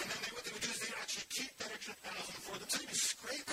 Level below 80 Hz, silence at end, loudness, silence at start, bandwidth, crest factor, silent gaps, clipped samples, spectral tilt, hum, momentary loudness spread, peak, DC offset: -74 dBFS; 0 s; -40 LUFS; 0 s; 16 kHz; 20 dB; none; under 0.1%; 0 dB/octave; none; 9 LU; -22 dBFS; under 0.1%